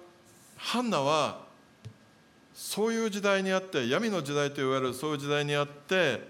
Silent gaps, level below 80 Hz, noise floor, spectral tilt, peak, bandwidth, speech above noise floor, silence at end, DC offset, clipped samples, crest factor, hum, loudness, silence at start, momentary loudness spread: none; -78 dBFS; -59 dBFS; -4.5 dB/octave; -12 dBFS; 17 kHz; 30 dB; 0 s; under 0.1%; under 0.1%; 20 dB; none; -29 LUFS; 0 s; 6 LU